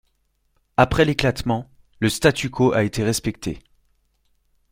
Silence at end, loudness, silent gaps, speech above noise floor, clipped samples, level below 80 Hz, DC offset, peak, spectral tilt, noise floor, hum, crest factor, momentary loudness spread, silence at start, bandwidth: 1.1 s; -21 LUFS; none; 48 dB; under 0.1%; -42 dBFS; under 0.1%; -2 dBFS; -5 dB/octave; -68 dBFS; none; 22 dB; 10 LU; 0.8 s; 16.5 kHz